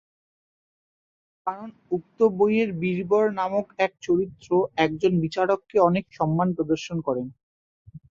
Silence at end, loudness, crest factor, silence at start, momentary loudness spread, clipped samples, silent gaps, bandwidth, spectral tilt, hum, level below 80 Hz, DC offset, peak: 0.15 s; -24 LUFS; 20 dB; 1.45 s; 10 LU; under 0.1%; 7.43-7.85 s; 7.4 kHz; -7 dB/octave; none; -60 dBFS; under 0.1%; -6 dBFS